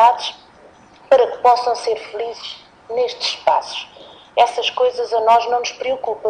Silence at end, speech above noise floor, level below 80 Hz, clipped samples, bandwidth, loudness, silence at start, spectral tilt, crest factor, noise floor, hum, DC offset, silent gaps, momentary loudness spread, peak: 0 s; 28 dB; -62 dBFS; under 0.1%; 9.8 kHz; -18 LUFS; 0 s; -1 dB/octave; 16 dB; -46 dBFS; none; under 0.1%; none; 14 LU; -2 dBFS